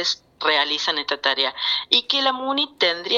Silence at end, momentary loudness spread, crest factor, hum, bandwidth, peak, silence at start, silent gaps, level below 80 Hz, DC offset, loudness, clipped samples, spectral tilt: 0 s; 5 LU; 22 dB; none; 12 kHz; 0 dBFS; 0 s; none; -68 dBFS; under 0.1%; -20 LUFS; under 0.1%; -0.5 dB/octave